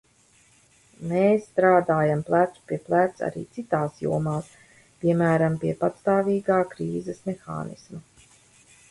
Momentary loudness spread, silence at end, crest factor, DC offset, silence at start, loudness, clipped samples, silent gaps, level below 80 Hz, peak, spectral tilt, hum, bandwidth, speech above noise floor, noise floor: 14 LU; 0.9 s; 18 dB; under 0.1%; 1 s; -24 LUFS; under 0.1%; none; -60 dBFS; -6 dBFS; -8 dB/octave; none; 11.5 kHz; 36 dB; -60 dBFS